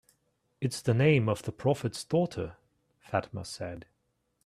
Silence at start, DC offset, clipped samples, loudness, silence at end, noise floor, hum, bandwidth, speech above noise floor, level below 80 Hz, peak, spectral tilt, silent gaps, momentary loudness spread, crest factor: 0.6 s; under 0.1%; under 0.1%; -30 LUFS; 0.65 s; -77 dBFS; none; 14.5 kHz; 48 dB; -62 dBFS; -10 dBFS; -6.5 dB/octave; none; 16 LU; 20 dB